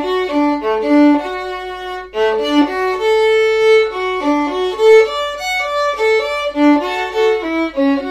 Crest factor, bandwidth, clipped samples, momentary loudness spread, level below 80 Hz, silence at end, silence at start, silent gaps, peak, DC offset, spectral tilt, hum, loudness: 14 dB; 14 kHz; under 0.1%; 8 LU; -46 dBFS; 0 s; 0 s; none; -2 dBFS; under 0.1%; -3.5 dB/octave; none; -14 LUFS